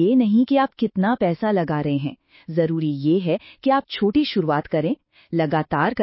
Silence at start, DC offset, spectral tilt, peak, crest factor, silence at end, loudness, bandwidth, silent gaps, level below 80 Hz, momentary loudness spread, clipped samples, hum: 0 s; under 0.1%; -11.5 dB/octave; -6 dBFS; 14 dB; 0 s; -21 LUFS; 5.8 kHz; none; -56 dBFS; 8 LU; under 0.1%; none